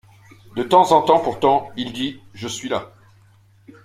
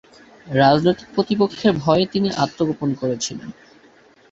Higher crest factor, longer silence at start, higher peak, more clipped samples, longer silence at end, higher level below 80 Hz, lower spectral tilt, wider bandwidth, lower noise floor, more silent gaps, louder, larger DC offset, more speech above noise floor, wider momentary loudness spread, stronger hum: about the same, 20 dB vs 18 dB; about the same, 0.55 s vs 0.45 s; about the same, -2 dBFS vs -2 dBFS; neither; first, 1 s vs 0.8 s; about the same, -56 dBFS vs -54 dBFS; about the same, -4.5 dB/octave vs -5.5 dB/octave; first, 15.5 kHz vs 8 kHz; about the same, -53 dBFS vs -51 dBFS; neither; about the same, -19 LUFS vs -19 LUFS; neither; about the same, 34 dB vs 32 dB; first, 15 LU vs 10 LU; neither